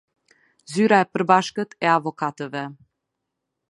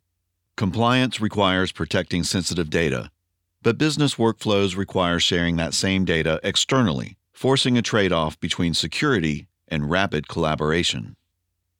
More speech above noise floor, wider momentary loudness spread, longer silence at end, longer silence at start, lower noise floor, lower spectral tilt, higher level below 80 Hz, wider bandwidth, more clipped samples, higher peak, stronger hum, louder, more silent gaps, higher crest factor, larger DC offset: first, 60 dB vs 54 dB; first, 13 LU vs 8 LU; first, 0.95 s vs 0.7 s; about the same, 0.7 s vs 0.6 s; first, -81 dBFS vs -76 dBFS; about the same, -5.5 dB/octave vs -4.5 dB/octave; second, -72 dBFS vs -46 dBFS; second, 11.5 kHz vs 17 kHz; neither; about the same, -2 dBFS vs -4 dBFS; neither; about the same, -21 LUFS vs -22 LUFS; neither; about the same, 22 dB vs 20 dB; neither